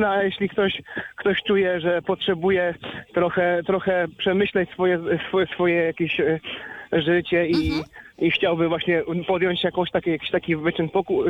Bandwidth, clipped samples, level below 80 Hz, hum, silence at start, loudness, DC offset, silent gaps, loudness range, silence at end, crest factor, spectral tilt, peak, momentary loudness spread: 6.2 kHz; under 0.1%; -50 dBFS; none; 0 s; -22 LUFS; under 0.1%; none; 1 LU; 0 s; 14 dB; -7.5 dB/octave; -8 dBFS; 5 LU